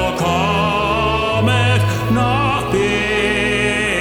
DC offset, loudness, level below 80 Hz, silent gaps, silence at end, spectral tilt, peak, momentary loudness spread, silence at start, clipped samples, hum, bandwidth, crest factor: under 0.1%; -16 LUFS; -32 dBFS; none; 0 s; -5.5 dB/octave; -2 dBFS; 2 LU; 0 s; under 0.1%; none; 18.5 kHz; 14 dB